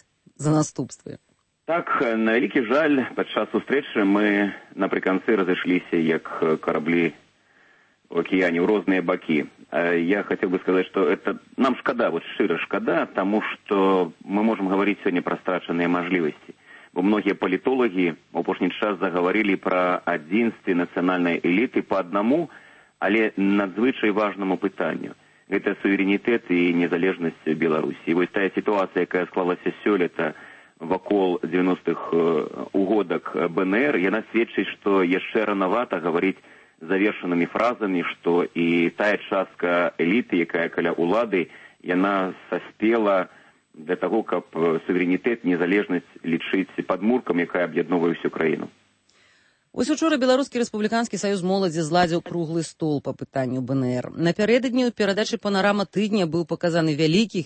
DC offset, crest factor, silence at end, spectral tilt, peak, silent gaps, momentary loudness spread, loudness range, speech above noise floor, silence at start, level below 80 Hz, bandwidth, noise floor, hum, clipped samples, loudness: under 0.1%; 16 dB; 0 s; -6 dB/octave; -8 dBFS; none; 6 LU; 2 LU; 38 dB; 0.4 s; -66 dBFS; 8.8 kHz; -61 dBFS; none; under 0.1%; -23 LUFS